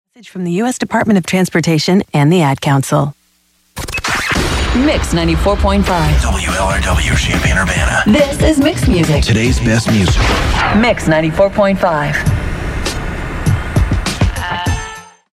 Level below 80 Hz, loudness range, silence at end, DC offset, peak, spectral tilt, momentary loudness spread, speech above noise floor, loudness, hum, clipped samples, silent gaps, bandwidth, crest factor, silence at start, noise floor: -20 dBFS; 3 LU; 0.3 s; under 0.1%; 0 dBFS; -5.5 dB/octave; 8 LU; 44 dB; -13 LUFS; none; under 0.1%; none; 16 kHz; 12 dB; 0.25 s; -56 dBFS